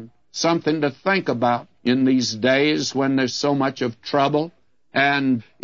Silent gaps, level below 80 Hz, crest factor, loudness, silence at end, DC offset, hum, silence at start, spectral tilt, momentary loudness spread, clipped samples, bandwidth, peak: none; -66 dBFS; 16 dB; -20 LUFS; 0.2 s; 0.1%; none; 0 s; -4.5 dB/octave; 6 LU; under 0.1%; 7.6 kHz; -4 dBFS